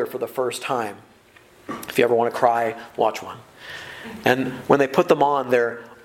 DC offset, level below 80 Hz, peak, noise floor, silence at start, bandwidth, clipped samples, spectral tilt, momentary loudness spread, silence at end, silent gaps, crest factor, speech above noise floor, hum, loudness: under 0.1%; -64 dBFS; 0 dBFS; -52 dBFS; 0 s; 17 kHz; under 0.1%; -5 dB/octave; 17 LU; 0.1 s; none; 22 dB; 30 dB; none; -21 LUFS